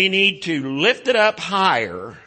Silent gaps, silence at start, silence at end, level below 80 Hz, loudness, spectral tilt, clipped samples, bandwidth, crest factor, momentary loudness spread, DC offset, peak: none; 0 s; 0.1 s; -64 dBFS; -18 LUFS; -4 dB/octave; under 0.1%; 8.8 kHz; 16 dB; 7 LU; under 0.1%; -4 dBFS